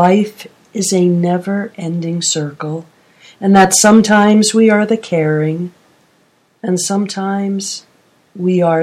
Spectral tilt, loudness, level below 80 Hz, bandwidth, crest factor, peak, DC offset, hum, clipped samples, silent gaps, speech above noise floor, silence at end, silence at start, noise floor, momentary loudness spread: -4.5 dB/octave; -13 LUFS; -56 dBFS; 15.5 kHz; 14 dB; 0 dBFS; under 0.1%; none; under 0.1%; none; 42 dB; 0 s; 0 s; -55 dBFS; 15 LU